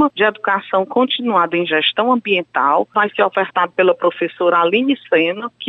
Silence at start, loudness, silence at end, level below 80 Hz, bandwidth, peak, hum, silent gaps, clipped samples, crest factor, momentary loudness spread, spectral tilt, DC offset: 0 s; -16 LUFS; 0 s; -68 dBFS; 4.2 kHz; -4 dBFS; none; none; under 0.1%; 14 dB; 3 LU; -7 dB/octave; under 0.1%